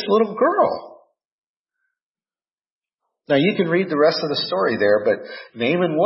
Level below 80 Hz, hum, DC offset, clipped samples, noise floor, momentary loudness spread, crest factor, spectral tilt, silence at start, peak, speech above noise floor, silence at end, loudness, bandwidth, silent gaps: -68 dBFS; none; under 0.1%; under 0.1%; under -90 dBFS; 6 LU; 16 dB; -9 dB/octave; 0 s; -4 dBFS; over 71 dB; 0 s; -19 LUFS; 6 kHz; 1.25-1.64 s, 2.03-2.15 s, 2.53-2.57 s, 2.72-2.82 s, 2.94-2.98 s